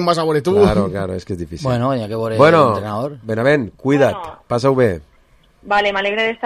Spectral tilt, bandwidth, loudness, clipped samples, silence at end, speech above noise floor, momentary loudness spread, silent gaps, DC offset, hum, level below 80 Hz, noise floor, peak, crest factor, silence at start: -6.5 dB/octave; 14 kHz; -16 LUFS; under 0.1%; 0 s; 36 dB; 11 LU; none; under 0.1%; none; -40 dBFS; -52 dBFS; 0 dBFS; 16 dB; 0 s